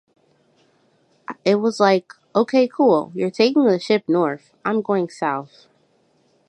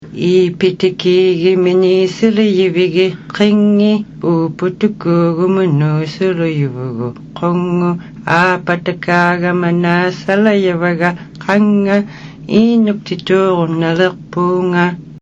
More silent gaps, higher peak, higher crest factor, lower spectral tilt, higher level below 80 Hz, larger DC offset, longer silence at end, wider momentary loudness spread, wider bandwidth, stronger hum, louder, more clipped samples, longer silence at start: neither; about the same, -2 dBFS vs 0 dBFS; first, 18 dB vs 12 dB; second, -6 dB/octave vs -7.5 dB/octave; second, -74 dBFS vs -52 dBFS; neither; first, 1.05 s vs 0.05 s; first, 9 LU vs 6 LU; first, 11 kHz vs 7.8 kHz; neither; second, -19 LUFS vs -13 LUFS; neither; first, 1.3 s vs 0 s